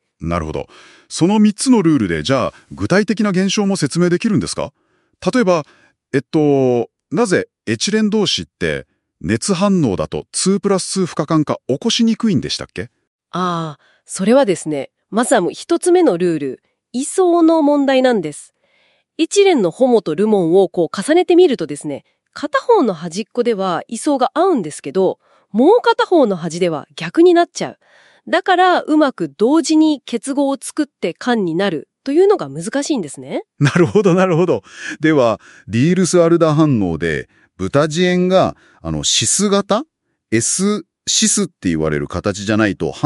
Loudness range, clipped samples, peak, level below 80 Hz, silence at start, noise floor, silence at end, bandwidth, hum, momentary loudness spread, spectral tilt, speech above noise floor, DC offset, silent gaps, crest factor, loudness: 3 LU; under 0.1%; -2 dBFS; -50 dBFS; 0.2 s; -59 dBFS; 0 s; 12 kHz; none; 12 LU; -5 dB/octave; 43 dB; under 0.1%; 13.07-13.19 s; 14 dB; -16 LUFS